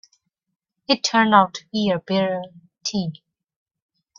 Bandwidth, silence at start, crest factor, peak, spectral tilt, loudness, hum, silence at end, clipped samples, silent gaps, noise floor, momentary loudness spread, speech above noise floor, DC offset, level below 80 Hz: 7.4 kHz; 0.9 s; 22 dB; -2 dBFS; -4 dB/octave; -20 LUFS; none; 1.05 s; under 0.1%; none; -68 dBFS; 15 LU; 47 dB; under 0.1%; -64 dBFS